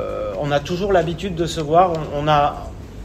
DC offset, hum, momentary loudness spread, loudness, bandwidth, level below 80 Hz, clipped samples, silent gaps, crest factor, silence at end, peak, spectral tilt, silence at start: under 0.1%; none; 9 LU; -19 LUFS; 15 kHz; -36 dBFS; under 0.1%; none; 18 dB; 0 s; -2 dBFS; -6 dB/octave; 0 s